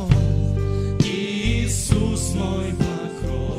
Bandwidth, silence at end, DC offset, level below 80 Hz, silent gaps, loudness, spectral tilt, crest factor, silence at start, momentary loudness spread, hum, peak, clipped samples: 15 kHz; 0 s; under 0.1%; -28 dBFS; none; -22 LUFS; -5.5 dB/octave; 18 dB; 0 s; 5 LU; none; -2 dBFS; under 0.1%